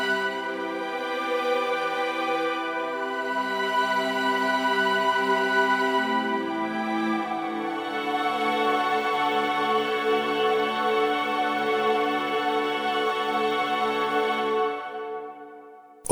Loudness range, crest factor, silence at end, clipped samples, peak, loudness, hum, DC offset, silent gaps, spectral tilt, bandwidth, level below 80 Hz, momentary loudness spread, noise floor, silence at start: 3 LU; 18 dB; 0 s; under 0.1%; -6 dBFS; -25 LUFS; none; under 0.1%; none; -3.5 dB/octave; over 20 kHz; -70 dBFS; 7 LU; -47 dBFS; 0 s